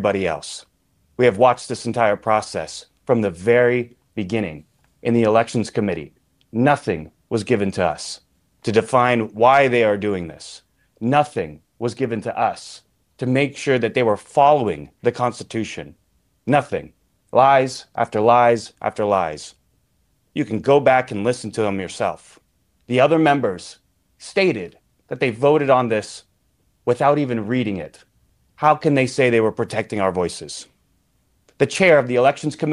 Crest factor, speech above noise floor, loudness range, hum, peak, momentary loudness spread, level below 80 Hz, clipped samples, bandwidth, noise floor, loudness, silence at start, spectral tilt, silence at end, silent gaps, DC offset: 18 dB; 46 dB; 3 LU; none; -2 dBFS; 16 LU; -56 dBFS; under 0.1%; 11.5 kHz; -65 dBFS; -19 LUFS; 0 s; -5.5 dB/octave; 0 s; none; under 0.1%